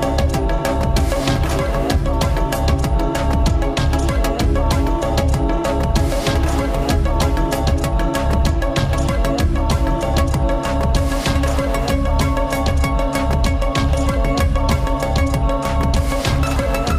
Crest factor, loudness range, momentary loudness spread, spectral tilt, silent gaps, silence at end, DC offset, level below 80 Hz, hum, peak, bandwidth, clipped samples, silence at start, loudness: 14 dB; 0 LU; 1 LU; -6 dB/octave; none; 0 s; under 0.1%; -20 dBFS; none; -2 dBFS; 16 kHz; under 0.1%; 0 s; -18 LUFS